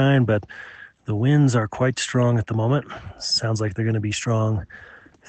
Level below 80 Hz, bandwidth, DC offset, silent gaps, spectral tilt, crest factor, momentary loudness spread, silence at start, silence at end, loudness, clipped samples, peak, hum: -52 dBFS; 9 kHz; under 0.1%; none; -6 dB/octave; 16 dB; 19 LU; 0 s; 0.35 s; -22 LUFS; under 0.1%; -6 dBFS; none